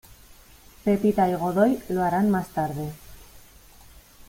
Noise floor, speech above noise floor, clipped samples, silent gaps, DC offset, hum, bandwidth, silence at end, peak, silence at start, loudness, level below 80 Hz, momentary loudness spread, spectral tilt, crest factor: -51 dBFS; 28 dB; under 0.1%; none; under 0.1%; none; 16.5 kHz; 0.9 s; -8 dBFS; 0.3 s; -24 LUFS; -52 dBFS; 11 LU; -7.5 dB/octave; 18 dB